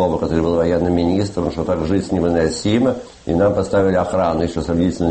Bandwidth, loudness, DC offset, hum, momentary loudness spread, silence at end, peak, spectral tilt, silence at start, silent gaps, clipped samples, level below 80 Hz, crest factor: 8.8 kHz; -18 LUFS; under 0.1%; none; 4 LU; 0 s; -4 dBFS; -7 dB/octave; 0 s; none; under 0.1%; -36 dBFS; 14 dB